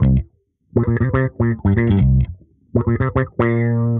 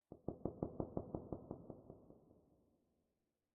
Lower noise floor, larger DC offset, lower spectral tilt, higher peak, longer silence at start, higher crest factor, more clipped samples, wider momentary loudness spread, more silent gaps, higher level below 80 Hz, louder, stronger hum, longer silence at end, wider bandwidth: second, -52 dBFS vs -89 dBFS; neither; first, -9.5 dB/octave vs -5 dB/octave; first, -2 dBFS vs -26 dBFS; about the same, 0 s vs 0.1 s; second, 14 dB vs 26 dB; neither; second, 7 LU vs 16 LU; neither; first, -28 dBFS vs -66 dBFS; first, -18 LUFS vs -49 LUFS; neither; second, 0 s vs 1.15 s; first, 3.8 kHz vs 1.7 kHz